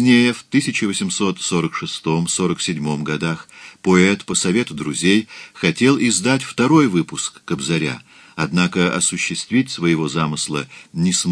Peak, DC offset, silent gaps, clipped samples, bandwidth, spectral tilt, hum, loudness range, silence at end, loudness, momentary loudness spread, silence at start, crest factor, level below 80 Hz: 0 dBFS; under 0.1%; none; under 0.1%; 11 kHz; -4 dB/octave; none; 3 LU; 0 s; -18 LUFS; 10 LU; 0 s; 18 dB; -54 dBFS